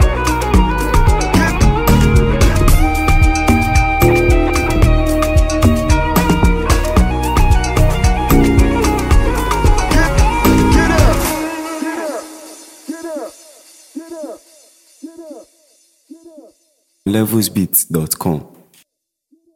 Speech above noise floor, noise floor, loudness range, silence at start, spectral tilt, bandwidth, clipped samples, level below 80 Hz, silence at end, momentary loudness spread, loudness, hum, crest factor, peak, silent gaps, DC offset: 50 dB; -67 dBFS; 18 LU; 0 s; -5.5 dB/octave; 17 kHz; under 0.1%; -16 dBFS; 1.15 s; 16 LU; -14 LUFS; none; 14 dB; 0 dBFS; none; under 0.1%